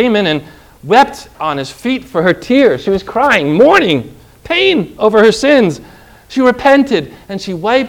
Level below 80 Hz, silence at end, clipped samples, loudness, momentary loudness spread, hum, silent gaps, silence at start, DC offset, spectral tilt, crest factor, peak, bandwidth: -44 dBFS; 0 s; 0.8%; -12 LUFS; 12 LU; none; none; 0 s; under 0.1%; -5 dB/octave; 12 dB; 0 dBFS; 17 kHz